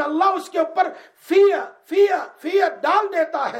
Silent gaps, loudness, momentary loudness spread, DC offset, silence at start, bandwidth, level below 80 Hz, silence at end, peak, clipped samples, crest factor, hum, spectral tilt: none; -20 LUFS; 8 LU; under 0.1%; 0 s; 14.5 kHz; -80 dBFS; 0 s; -6 dBFS; under 0.1%; 14 dB; none; -3 dB/octave